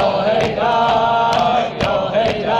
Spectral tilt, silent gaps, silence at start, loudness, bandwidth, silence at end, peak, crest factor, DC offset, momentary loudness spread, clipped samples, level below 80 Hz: -5.5 dB/octave; none; 0 s; -16 LUFS; 9.6 kHz; 0 s; -4 dBFS; 12 dB; under 0.1%; 3 LU; under 0.1%; -42 dBFS